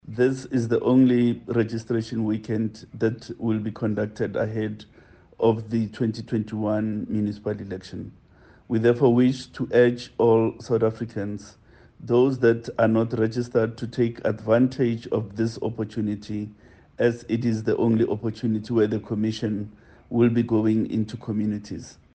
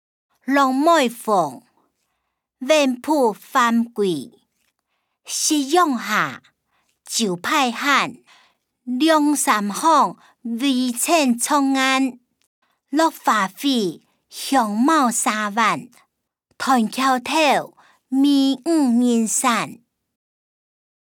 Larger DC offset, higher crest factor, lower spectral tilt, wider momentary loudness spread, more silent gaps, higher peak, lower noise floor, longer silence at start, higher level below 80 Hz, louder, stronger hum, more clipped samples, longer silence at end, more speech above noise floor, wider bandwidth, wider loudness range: neither; about the same, 18 dB vs 18 dB; first, -8 dB/octave vs -3 dB/octave; about the same, 11 LU vs 11 LU; second, none vs 12.47-12.62 s; about the same, -6 dBFS vs -4 dBFS; second, -53 dBFS vs -76 dBFS; second, 0.05 s vs 0.45 s; first, -58 dBFS vs -74 dBFS; second, -24 LUFS vs -19 LUFS; neither; neither; second, 0.25 s vs 1.4 s; second, 29 dB vs 57 dB; second, 8.8 kHz vs 19.5 kHz; about the same, 4 LU vs 3 LU